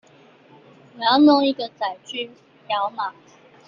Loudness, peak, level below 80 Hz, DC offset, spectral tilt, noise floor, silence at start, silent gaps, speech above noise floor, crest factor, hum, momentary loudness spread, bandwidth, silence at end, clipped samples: -21 LUFS; -4 dBFS; -72 dBFS; under 0.1%; -5 dB/octave; -51 dBFS; 0.95 s; none; 31 dB; 18 dB; none; 16 LU; 7.4 kHz; 0.55 s; under 0.1%